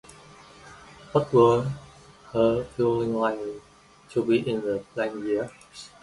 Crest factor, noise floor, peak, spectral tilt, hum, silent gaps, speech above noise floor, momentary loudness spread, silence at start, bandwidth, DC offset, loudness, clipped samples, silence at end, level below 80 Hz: 18 dB; -50 dBFS; -8 dBFS; -7 dB/octave; none; none; 25 dB; 19 LU; 0.65 s; 11.5 kHz; under 0.1%; -25 LUFS; under 0.1%; 0.15 s; -56 dBFS